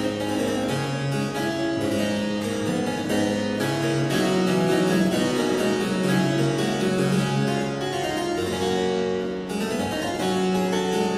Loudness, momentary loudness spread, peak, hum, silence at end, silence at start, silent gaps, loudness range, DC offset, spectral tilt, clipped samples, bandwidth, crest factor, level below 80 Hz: -24 LUFS; 5 LU; -8 dBFS; none; 0 s; 0 s; none; 3 LU; under 0.1%; -5.5 dB/octave; under 0.1%; 15.5 kHz; 14 dB; -54 dBFS